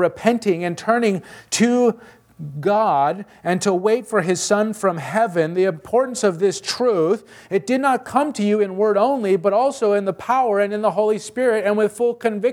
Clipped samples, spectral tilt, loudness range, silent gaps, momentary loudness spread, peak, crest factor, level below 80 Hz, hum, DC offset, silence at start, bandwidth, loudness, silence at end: under 0.1%; -5 dB/octave; 1 LU; none; 5 LU; -2 dBFS; 18 dB; -64 dBFS; none; under 0.1%; 0 s; 16 kHz; -19 LUFS; 0 s